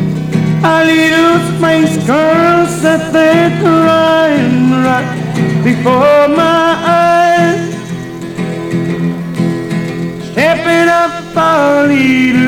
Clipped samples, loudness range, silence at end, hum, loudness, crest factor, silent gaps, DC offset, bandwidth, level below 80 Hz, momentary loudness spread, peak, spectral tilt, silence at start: under 0.1%; 4 LU; 0 s; none; -10 LUFS; 10 dB; none; 0.2%; 17.5 kHz; -44 dBFS; 9 LU; 0 dBFS; -6 dB/octave; 0 s